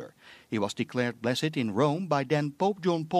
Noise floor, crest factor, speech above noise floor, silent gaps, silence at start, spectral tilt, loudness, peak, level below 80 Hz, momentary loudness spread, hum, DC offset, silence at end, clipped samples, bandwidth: -49 dBFS; 18 dB; 21 dB; none; 0 s; -6 dB/octave; -29 LUFS; -10 dBFS; -74 dBFS; 5 LU; none; under 0.1%; 0 s; under 0.1%; 14 kHz